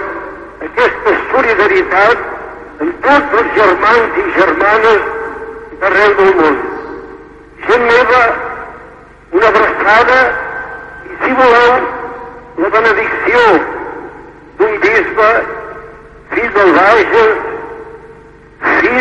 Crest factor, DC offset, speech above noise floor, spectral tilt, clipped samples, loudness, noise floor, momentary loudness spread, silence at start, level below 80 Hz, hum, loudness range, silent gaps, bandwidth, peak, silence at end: 12 dB; under 0.1%; 28 dB; -5 dB/octave; under 0.1%; -10 LUFS; -37 dBFS; 18 LU; 0 s; -40 dBFS; none; 2 LU; none; 9 kHz; 0 dBFS; 0 s